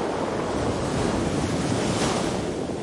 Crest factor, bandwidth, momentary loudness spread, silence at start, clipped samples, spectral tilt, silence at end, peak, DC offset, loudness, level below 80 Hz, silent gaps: 14 dB; 11.5 kHz; 3 LU; 0 s; under 0.1%; -5 dB/octave; 0 s; -12 dBFS; under 0.1%; -25 LUFS; -42 dBFS; none